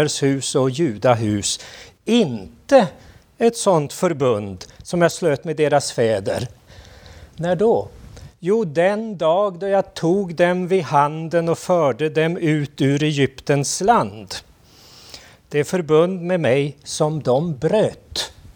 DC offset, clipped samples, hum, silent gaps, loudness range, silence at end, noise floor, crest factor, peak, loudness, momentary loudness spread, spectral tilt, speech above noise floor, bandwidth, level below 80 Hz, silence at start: under 0.1%; under 0.1%; none; none; 3 LU; 0.05 s; -48 dBFS; 18 dB; 0 dBFS; -19 LUFS; 10 LU; -5 dB/octave; 29 dB; 20 kHz; -52 dBFS; 0 s